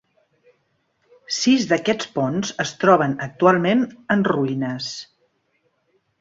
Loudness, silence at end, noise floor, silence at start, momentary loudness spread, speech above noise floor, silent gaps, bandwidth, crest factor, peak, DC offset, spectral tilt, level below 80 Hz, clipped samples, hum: -20 LUFS; 1.15 s; -68 dBFS; 1.3 s; 10 LU; 48 dB; none; 7.8 kHz; 20 dB; -2 dBFS; under 0.1%; -5 dB/octave; -62 dBFS; under 0.1%; none